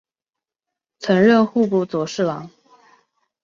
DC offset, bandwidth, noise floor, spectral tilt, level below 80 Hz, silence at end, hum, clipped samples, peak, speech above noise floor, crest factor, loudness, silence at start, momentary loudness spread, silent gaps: under 0.1%; 7.6 kHz; -88 dBFS; -6.5 dB/octave; -64 dBFS; 0.95 s; none; under 0.1%; -2 dBFS; 71 dB; 18 dB; -18 LUFS; 1 s; 12 LU; none